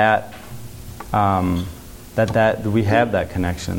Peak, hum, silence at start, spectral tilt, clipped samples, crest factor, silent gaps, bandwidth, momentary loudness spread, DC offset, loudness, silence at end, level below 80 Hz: -2 dBFS; none; 0 s; -6.5 dB/octave; under 0.1%; 18 dB; none; 17 kHz; 19 LU; under 0.1%; -20 LUFS; 0 s; -40 dBFS